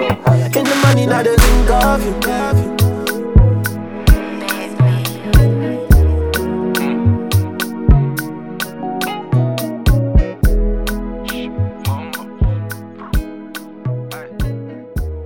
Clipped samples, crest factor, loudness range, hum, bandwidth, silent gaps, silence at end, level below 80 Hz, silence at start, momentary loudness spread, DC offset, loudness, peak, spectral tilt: under 0.1%; 14 dB; 9 LU; none; 19 kHz; none; 0 s; -18 dBFS; 0 s; 12 LU; 0.4%; -16 LUFS; 0 dBFS; -6 dB/octave